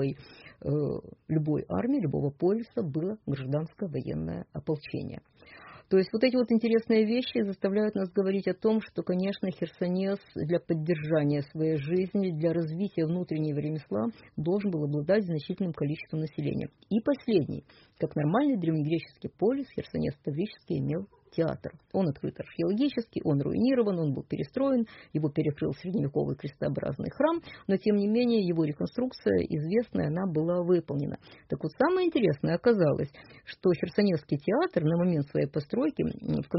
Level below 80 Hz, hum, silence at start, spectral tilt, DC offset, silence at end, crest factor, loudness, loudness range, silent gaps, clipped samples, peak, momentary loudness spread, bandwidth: -60 dBFS; none; 0 s; -7 dB/octave; under 0.1%; 0 s; 16 dB; -29 LUFS; 4 LU; none; under 0.1%; -12 dBFS; 9 LU; 5.8 kHz